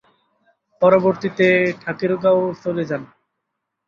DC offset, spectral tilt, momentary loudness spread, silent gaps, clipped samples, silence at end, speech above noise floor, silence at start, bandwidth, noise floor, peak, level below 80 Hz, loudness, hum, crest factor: under 0.1%; -7.5 dB/octave; 10 LU; none; under 0.1%; 0.8 s; 60 dB; 0.8 s; 7 kHz; -78 dBFS; -2 dBFS; -62 dBFS; -18 LUFS; none; 18 dB